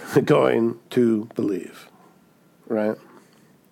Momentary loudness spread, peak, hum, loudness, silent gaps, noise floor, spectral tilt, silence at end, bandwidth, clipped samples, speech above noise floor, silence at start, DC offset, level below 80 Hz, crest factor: 13 LU; -4 dBFS; none; -22 LUFS; none; -56 dBFS; -7 dB/octave; 0.75 s; 17 kHz; under 0.1%; 35 dB; 0 s; under 0.1%; -74 dBFS; 20 dB